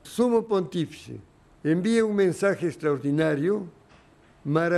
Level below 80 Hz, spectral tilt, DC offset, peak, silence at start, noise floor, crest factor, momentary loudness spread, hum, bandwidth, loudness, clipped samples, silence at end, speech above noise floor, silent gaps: -62 dBFS; -6.5 dB/octave; under 0.1%; -10 dBFS; 0.05 s; -55 dBFS; 16 dB; 16 LU; none; 13 kHz; -25 LUFS; under 0.1%; 0 s; 31 dB; none